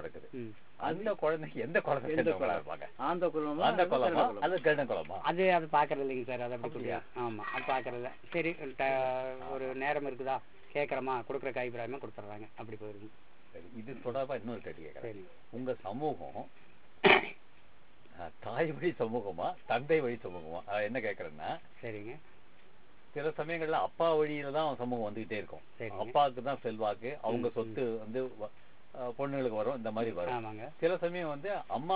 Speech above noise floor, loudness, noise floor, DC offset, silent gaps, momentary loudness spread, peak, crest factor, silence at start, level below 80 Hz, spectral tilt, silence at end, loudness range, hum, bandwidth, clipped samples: 29 dB; -34 LUFS; -63 dBFS; 0.5%; none; 16 LU; -10 dBFS; 24 dB; 0 s; -68 dBFS; -3.5 dB/octave; 0 s; 9 LU; none; 4 kHz; under 0.1%